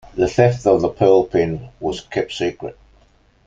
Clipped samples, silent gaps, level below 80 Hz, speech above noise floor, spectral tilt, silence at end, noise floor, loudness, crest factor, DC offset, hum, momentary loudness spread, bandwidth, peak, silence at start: under 0.1%; none; -46 dBFS; 37 dB; -6.5 dB/octave; 0.75 s; -54 dBFS; -18 LUFS; 16 dB; under 0.1%; none; 12 LU; 7.8 kHz; -2 dBFS; 0.15 s